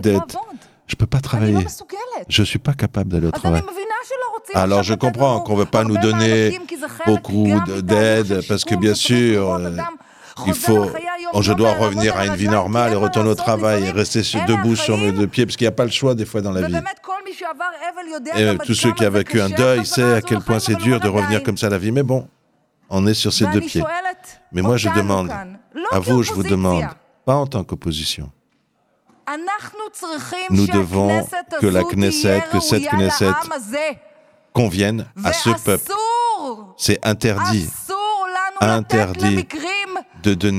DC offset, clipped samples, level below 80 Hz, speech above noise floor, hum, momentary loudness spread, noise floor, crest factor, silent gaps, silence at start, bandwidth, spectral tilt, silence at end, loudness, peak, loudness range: under 0.1%; under 0.1%; -46 dBFS; 46 dB; none; 11 LU; -64 dBFS; 18 dB; none; 0 s; 16 kHz; -5 dB/octave; 0 s; -18 LUFS; 0 dBFS; 4 LU